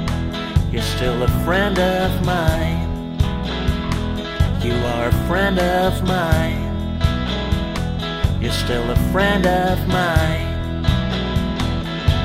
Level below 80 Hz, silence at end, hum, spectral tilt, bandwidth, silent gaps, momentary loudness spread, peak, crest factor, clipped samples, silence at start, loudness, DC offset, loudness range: -26 dBFS; 0 s; none; -6 dB/octave; 16 kHz; none; 6 LU; -2 dBFS; 16 dB; under 0.1%; 0 s; -20 LUFS; under 0.1%; 2 LU